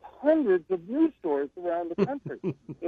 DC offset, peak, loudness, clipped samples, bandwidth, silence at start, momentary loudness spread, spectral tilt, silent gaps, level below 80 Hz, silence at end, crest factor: under 0.1%; -10 dBFS; -28 LUFS; under 0.1%; 4.7 kHz; 0.05 s; 10 LU; -9.5 dB/octave; none; -68 dBFS; 0 s; 18 dB